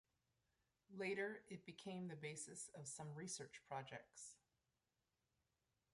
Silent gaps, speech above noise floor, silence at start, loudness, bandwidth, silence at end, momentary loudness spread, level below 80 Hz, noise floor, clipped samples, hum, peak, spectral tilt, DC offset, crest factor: none; over 38 dB; 0.9 s; -52 LUFS; 11.5 kHz; 1.55 s; 11 LU; -90 dBFS; under -90 dBFS; under 0.1%; none; -34 dBFS; -4 dB/octave; under 0.1%; 20 dB